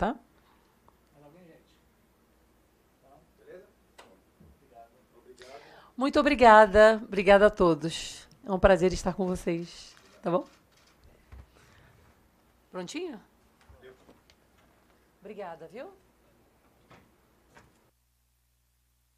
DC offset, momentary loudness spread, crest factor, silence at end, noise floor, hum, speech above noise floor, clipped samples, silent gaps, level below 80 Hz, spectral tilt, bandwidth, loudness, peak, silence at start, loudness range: under 0.1%; 28 LU; 26 dB; 3.3 s; -71 dBFS; 60 Hz at -65 dBFS; 48 dB; under 0.1%; none; -50 dBFS; -5.5 dB/octave; 13 kHz; -23 LUFS; -4 dBFS; 0 s; 23 LU